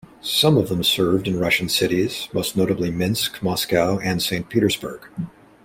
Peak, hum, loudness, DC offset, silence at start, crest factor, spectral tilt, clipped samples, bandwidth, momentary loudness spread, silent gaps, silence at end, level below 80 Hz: -4 dBFS; none; -20 LUFS; under 0.1%; 0.25 s; 18 dB; -4.5 dB/octave; under 0.1%; 16.5 kHz; 9 LU; none; 0.35 s; -50 dBFS